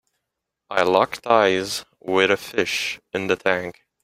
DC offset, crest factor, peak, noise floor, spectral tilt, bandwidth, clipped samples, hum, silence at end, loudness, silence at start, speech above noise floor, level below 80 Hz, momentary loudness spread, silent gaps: under 0.1%; 20 dB; -2 dBFS; -82 dBFS; -3.5 dB/octave; 16 kHz; under 0.1%; none; 0.35 s; -21 LUFS; 0.7 s; 61 dB; -62 dBFS; 10 LU; none